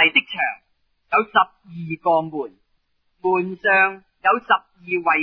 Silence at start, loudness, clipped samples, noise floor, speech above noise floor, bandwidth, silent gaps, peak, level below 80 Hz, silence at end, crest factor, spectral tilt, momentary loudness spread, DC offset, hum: 0 s; -20 LUFS; under 0.1%; -68 dBFS; 48 dB; 5.4 kHz; none; -2 dBFS; -64 dBFS; 0 s; 18 dB; -7.5 dB/octave; 15 LU; under 0.1%; none